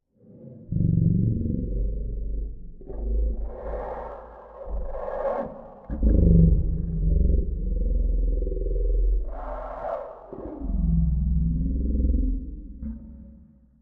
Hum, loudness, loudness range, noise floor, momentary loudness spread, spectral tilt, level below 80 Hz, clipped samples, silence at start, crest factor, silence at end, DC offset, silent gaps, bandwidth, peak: none; -27 LUFS; 8 LU; -52 dBFS; 17 LU; -13.5 dB/octave; -26 dBFS; under 0.1%; 0.3 s; 18 dB; 0.45 s; under 0.1%; none; 2.3 kHz; -6 dBFS